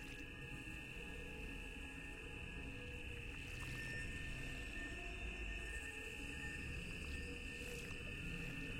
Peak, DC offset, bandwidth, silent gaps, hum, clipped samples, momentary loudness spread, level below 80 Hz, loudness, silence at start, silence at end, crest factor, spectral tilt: -34 dBFS; under 0.1%; 16 kHz; none; none; under 0.1%; 4 LU; -54 dBFS; -48 LUFS; 0 s; 0 s; 14 dB; -4 dB/octave